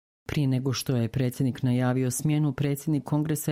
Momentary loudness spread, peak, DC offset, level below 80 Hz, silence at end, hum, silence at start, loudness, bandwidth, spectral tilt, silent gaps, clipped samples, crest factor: 3 LU; -14 dBFS; under 0.1%; -56 dBFS; 0 s; none; 0.3 s; -27 LUFS; 16 kHz; -6 dB/octave; none; under 0.1%; 12 dB